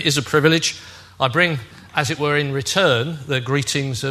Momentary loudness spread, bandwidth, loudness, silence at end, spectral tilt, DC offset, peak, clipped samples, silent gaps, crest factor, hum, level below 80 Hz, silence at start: 7 LU; 13.5 kHz; -19 LUFS; 0 s; -4 dB/octave; under 0.1%; 0 dBFS; under 0.1%; none; 20 dB; none; -54 dBFS; 0 s